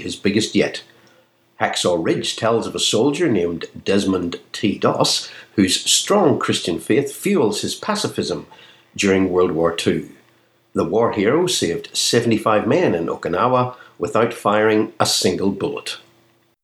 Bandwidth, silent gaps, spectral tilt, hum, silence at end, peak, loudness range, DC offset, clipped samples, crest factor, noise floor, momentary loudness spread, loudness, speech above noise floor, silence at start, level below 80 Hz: 15.5 kHz; none; -4 dB/octave; none; 0.65 s; -2 dBFS; 2 LU; under 0.1%; under 0.1%; 18 dB; -58 dBFS; 8 LU; -19 LUFS; 39 dB; 0 s; -56 dBFS